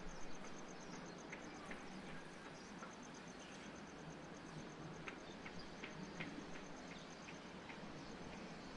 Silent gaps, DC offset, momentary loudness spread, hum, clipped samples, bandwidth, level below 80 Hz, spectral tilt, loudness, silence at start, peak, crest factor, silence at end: none; under 0.1%; 3 LU; none; under 0.1%; 11 kHz; -66 dBFS; -4.5 dB/octave; -53 LUFS; 0 s; -32 dBFS; 20 dB; 0 s